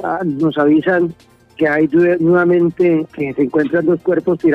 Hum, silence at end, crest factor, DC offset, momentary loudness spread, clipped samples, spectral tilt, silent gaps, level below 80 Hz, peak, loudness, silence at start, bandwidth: none; 0 s; 12 dB; under 0.1%; 6 LU; under 0.1%; -9 dB/octave; none; -54 dBFS; -4 dBFS; -15 LUFS; 0 s; 4.6 kHz